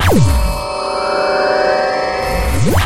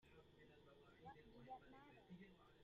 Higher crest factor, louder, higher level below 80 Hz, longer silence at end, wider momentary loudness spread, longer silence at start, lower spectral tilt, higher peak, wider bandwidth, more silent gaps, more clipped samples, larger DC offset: second, 12 dB vs 18 dB; first, -15 LUFS vs -65 LUFS; first, -22 dBFS vs -80 dBFS; about the same, 0 s vs 0 s; about the same, 6 LU vs 8 LU; about the same, 0 s vs 0 s; about the same, -5.5 dB/octave vs -4.5 dB/octave; first, 0 dBFS vs -46 dBFS; first, 16 kHz vs 7.2 kHz; neither; neither; neither